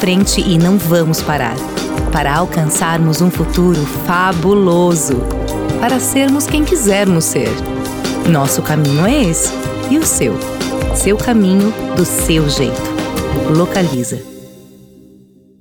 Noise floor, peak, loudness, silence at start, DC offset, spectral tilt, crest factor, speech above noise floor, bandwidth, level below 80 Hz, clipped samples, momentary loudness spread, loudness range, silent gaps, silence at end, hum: -44 dBFS; -2 dBFS; -14 LUFS; 0 s; under 0.1%; -5 dB/octave; 12 dB; 31 dB; over 20 kHz; -28 dBFS; under 0.1%; 8 LU; 2 LU; none; 1 s; none